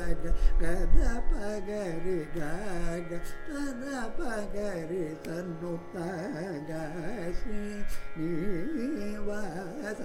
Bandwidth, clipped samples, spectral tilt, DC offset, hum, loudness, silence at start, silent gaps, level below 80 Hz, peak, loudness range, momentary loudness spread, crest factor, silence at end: 11 kHz; under 0.1%; -6.5 dB/octave; under 0.1%; none; -35 LUFS; 0 s; none; -32 dBFS; -8 dBFS; 3 LU; 6 LU; 18 dB; 0 s